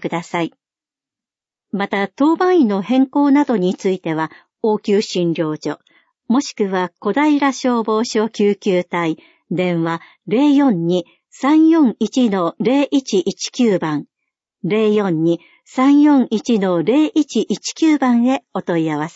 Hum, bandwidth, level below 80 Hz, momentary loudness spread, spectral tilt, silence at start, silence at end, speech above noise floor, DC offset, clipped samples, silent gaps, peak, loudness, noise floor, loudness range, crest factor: none; 8 kHz; -68 dBFS; 10 LU; -6 dB/octave; 0 s; 0.05 s; over 74 dB; under 0.1%; under 0.1%; none; -4 dBFS; -17 LUFS; under -90 dBFS; 3 LU; 14 dB